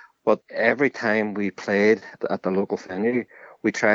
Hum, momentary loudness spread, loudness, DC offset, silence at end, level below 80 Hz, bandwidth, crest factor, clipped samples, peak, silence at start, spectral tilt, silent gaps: none; 8 LU; -23 LUFS; under 0.1%; 0 s; -74 dBFS; 7.8 kHz; 20 dB; under 0.1%; -4 dBFS; 0.25 s; -6 dB/octave; none